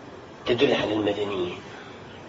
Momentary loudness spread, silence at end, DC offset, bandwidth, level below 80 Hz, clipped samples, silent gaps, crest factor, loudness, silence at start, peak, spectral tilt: 19 LU; 0 s; under 0.1%; 7.8 kHz; -56 dBFS; under 0.1%; none; 20 dB; -25 LUFS; 0 s; -8 dBFS; -5.5 dB/octave